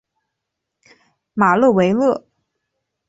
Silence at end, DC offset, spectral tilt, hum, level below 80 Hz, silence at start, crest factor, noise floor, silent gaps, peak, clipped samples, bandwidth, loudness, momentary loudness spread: 0.9 s; under 0.1%; -7.5 dB/octave; none; -60 dBFS; 1.35 s; 18 dB; -79 dBFS; none; -2 dBFS; under 0.1%; 8 kHz; -16 LUFS; 13 LU